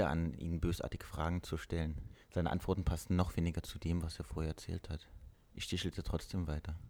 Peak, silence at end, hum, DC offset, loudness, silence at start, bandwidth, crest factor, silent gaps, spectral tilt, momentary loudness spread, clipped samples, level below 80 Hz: -18 dBFS; 0 s; none; under 0.1%; -39 LUFS; 0 s; 18 kHz; 20 dB; none; -6.5 dB/octave; 9 LU; under 0.1%; -46 dBFS